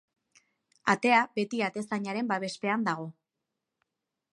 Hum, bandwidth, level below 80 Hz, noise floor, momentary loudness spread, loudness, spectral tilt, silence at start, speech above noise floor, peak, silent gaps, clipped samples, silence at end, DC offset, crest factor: none; 11.5 kHz; -82 dBFS; -86 dBFS; 10 LU; -29 LUFS; -5 dB/octave; 0.85 s; 57 dB; -8 dBFS; none; under 0.1%; 1.25 s; under 0.1%; 22 dB